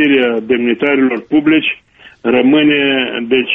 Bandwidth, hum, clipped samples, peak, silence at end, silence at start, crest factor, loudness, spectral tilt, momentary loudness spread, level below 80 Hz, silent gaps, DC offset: 3.8 kHz; none; under 0.1%; 0 dBFS; 0 s; 0 s; 12 dB; -12 LUFS; -7.5 dB/octave; 6 LU; -52 dBFS; none; under 0.1%